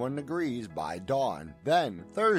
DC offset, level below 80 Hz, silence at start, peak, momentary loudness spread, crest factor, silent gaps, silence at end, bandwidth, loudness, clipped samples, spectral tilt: under 0.1%; -62 dBFS; 0 s; -14 dBFS; 9 LU; 16 dB; none; 0 s; 15.5 kHz; -31 LUFS; under 0.1%; -6 dB/octave